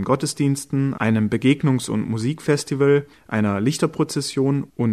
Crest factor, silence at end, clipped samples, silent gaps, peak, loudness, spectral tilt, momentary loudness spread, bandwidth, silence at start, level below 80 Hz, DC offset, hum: 16 dB; 0 s; under 0.1%; none; -4 dBFS; -21 LUFS; -6 dB/octave; 5 LU; 13.5 kHz; 0 s; -56 dBFS; under 0.1%; none